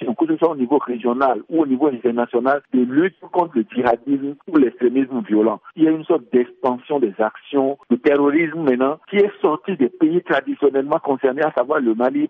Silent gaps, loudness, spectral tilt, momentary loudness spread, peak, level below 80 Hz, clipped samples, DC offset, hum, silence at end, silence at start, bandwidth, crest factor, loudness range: none; -19 LUFS; -9 dB/octave; 4 LU; -4 dBFS; -66 dBFS; under 0.1%; under 0.1%; none; 0.05 s; 0 s; 4.5 kHz; 14 dB; 1 LU